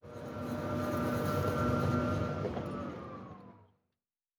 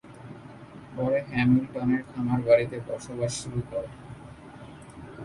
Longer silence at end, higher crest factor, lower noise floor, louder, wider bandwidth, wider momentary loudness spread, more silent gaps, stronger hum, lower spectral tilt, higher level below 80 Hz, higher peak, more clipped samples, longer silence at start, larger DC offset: first, 0.75 s vs 0 s; about the same, 16 dB vs 20 dB; first, under -90 dBFS vs -45 dBFS; second, -35 LUFS vs -27 LUFS; first, over 20 kHz vs 11.5 kHz; second, 15 LU vs 23 LU; neither; neither; about the same, -7.5 dB/octave vs -6.5 dB/octave; about the same, -54 dBFS vs -54 dBFS; second, -18 dBFS vs -8 dBFS; neither; about the same, 0.05 s vs 0.05 s; neither